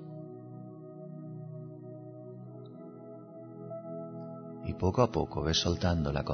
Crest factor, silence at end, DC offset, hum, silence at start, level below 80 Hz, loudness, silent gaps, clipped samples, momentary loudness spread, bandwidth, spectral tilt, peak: 24 dB; 0 s; under 0.1%; none; 0 s; -50 dBFS; -33 LUFS; none; under 0.1%; 19 LU; 6.4 kHz; -5 dB/octave; -12 dBFS